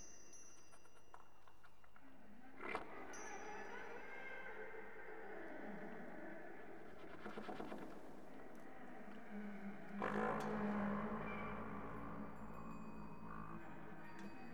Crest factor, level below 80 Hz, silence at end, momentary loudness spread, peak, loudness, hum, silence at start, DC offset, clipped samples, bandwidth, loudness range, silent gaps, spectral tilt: 24 dB; -70 dBFS; 0 s; 22 LU; -28 dBFS; -50 LUFS; 50 Hz at -80 dBFS; 0 s; 0.3%; under 0.1%; over 20 kHz; 9 LU; none; -5.5 dB/octave